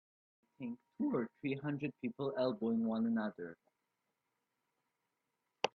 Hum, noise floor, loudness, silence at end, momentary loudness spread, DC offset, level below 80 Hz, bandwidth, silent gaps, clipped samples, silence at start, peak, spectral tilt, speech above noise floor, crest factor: none; -87 dBFS; -39 LUFS; 0.05 s; 12 LU; under 0.1%; -84 dBFS; 7 kHz; none; under 0.1%; 0.6 s; -18 dBFS; -6.5 dB/octave; 48 dB; 24 dB